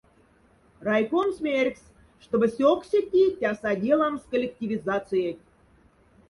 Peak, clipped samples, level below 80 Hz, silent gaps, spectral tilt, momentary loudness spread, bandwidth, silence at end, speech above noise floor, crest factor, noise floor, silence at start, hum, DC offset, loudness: -8 dBFS; under 0.1%; -60 dBFS; none; -6.5 dB/octave; 8 LU; 11.5 kHz; 0.95 s; 36 dB; 18 dB; -60 dBFS; 0.8 s; none; under 0.1%; -25 LUFS